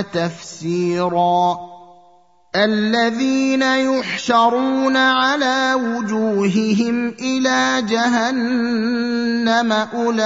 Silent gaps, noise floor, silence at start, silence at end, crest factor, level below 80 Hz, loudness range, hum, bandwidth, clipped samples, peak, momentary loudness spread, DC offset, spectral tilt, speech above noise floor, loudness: none; -53 dBFS; 0 s; 0 s; 14 dB; -64 dBFS; 2 LU; none; 7.8 kHz; under 0.1%; -2 dBFS; 6 LU; 0.1%; -4.5 dB/octave; 36 dB; -17 LUFS